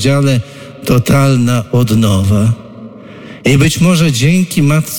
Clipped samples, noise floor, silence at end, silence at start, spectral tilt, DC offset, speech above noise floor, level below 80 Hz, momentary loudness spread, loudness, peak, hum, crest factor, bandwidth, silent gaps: under 0.1%; -31 dBFS; 0 s; 0 s; -6 dB/octave; under 0.1%; 21 dB; -36 dBFS; 17 LU; -11 LUFS; 0 dBFS; none; 10 dB; 18.5 kHz; none